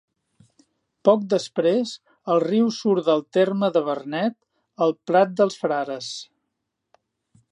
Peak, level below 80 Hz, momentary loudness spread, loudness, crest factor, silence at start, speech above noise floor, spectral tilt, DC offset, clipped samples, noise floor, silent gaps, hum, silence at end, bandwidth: -4 dBFS; -78 dBFS; 9 LU; -22 LUFS; 20 dB; 1.05 s; 58 dB; -6 dB/octave; under 0.1%; under 0.1%; -79 dBFS; none; none; 1.3 s; 10.5 kHz